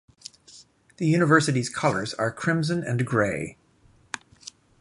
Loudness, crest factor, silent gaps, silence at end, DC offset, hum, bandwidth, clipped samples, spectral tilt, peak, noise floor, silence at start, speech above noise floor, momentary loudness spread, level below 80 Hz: -24 LUFS; 20 dB; none; 0.3 s; under 0.1%; none; 11.5 kHz; under 0.1%; -5.5 dB/octave; -6 dBFS; -59 dBFS; 0.55 s; 36 dB; 24 LU; -58 dBFS